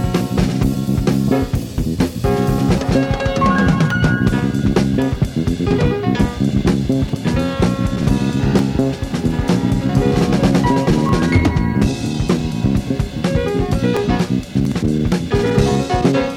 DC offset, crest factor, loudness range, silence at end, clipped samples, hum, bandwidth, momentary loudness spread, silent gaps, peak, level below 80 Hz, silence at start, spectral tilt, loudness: under 0.1%; 16 dB; 2 LU; 0 s; under 0.1%; none; 16.5 kHz; 4 LU; none; 0 dBFS; -28 dBFS; 0 s; -7 dB/octave; -17 LUFS